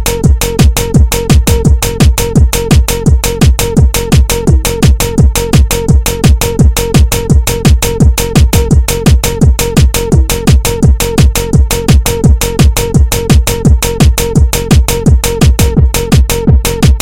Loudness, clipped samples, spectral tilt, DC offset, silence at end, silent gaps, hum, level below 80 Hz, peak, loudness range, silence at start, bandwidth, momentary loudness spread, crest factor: -9 LUFS; 0.5%; -5 dB/octave; 0.6%; 0 s; none; none; -10 dBFS; 0 dBFS; 0 LU; 0 s; 17 kHz; 2 LU; 8 dB